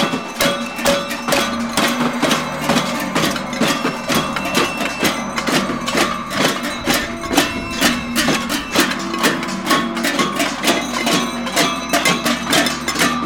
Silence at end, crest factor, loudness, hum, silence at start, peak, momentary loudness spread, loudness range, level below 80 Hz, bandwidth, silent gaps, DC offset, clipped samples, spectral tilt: 0 s; 18 dB; -17 LUFS; none; 0 s; -2 dBFS; 3 LU; 1 LU; -44 dBFS; over 20 kHz; none; 0.3%; under 0.1%; -3 dB/octave